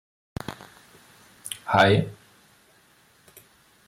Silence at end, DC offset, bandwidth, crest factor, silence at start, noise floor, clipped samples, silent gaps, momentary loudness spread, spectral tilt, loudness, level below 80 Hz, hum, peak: 1.75 s; under 0.1%; 16 kHz; 22 dB; 0.5 s; -59 dBFS; under 0.1%; none; 23 LU; -5 dB/octave; -23 LUFS; -58 dBFS; none; -6 dBFS